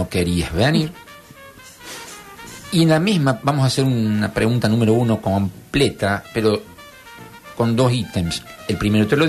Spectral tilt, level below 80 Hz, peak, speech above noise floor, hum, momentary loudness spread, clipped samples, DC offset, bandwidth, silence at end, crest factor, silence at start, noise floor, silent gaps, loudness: -6 dB/octave; -42 dBFS; -4 dBFS; 24 dB; none; 21 LU; under 0.1%; under 0.1%; 13.5 kHz; 0 s; 14 dB; 0 s; -42 dBFS; none; -19 LUFS